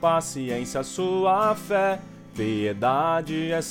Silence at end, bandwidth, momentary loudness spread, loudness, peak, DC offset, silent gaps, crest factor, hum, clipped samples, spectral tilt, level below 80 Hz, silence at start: 0 s; 17 kHz; 8 LU; -25 LUFS; -10 dBFS; under 0.1%; none; 16 dB; none; under 0.1%; -5 dB/octave; -56 dBFS; 0 s